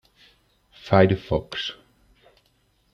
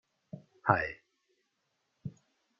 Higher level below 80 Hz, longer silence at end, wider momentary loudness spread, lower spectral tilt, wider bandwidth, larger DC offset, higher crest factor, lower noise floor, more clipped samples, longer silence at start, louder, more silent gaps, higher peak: first, -50 dBFS vs -66 dBFS; first, 1.2 s vs 0.5 s; second, 14 LU vs 22 LU; first, -7 dB/octave vs -5.5 dB/octave; about the same, 7 kHz vs 7.2 kHz; neither; second, 24 dB vs 32 dB; second, -65 dBFS vs -80 dBFS; neither; first, 0.85 s vs 0.35 s; first, -22 LUFS vs -31 LUFS; neither; first, -2 dBFS vs -6 dBFS